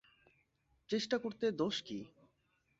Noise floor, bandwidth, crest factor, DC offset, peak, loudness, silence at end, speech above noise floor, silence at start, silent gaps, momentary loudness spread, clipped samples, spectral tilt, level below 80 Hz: -78 dBFS; 7.6 kHz; 18 dB; under 0.1%; -22 dBFS; -38 LUFS; 0.75 s; 41 dB; 0.9 s; none; 12 LU; under 0.1%; -3.5 dB/octave; -78 dBFS